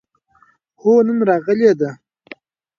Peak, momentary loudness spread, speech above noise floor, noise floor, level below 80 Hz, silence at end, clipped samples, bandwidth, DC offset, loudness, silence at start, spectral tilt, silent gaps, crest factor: -2 dBFS; 7 LU; 42 dB; -56 dBFS; -66 dBFS; 0.85 s; under 0.1%; 7 kHz; under 0.1%; -16 LUFS; 0.85 s; -7.5 dB/octave; none; 16 dB